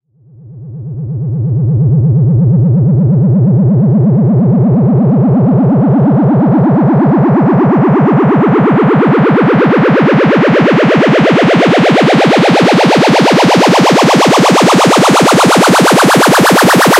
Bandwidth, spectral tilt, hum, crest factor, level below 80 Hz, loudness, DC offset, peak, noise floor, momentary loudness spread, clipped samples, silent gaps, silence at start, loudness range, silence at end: 16 kHz; -6 dB/octave; none; 8 dB; -42 dBFS; -8 LUFS; under 0.1%; 0 dBFS; -37 dBFS; 3 LU; under 0.1%; none; 0.45 s; 3 LU; 0 s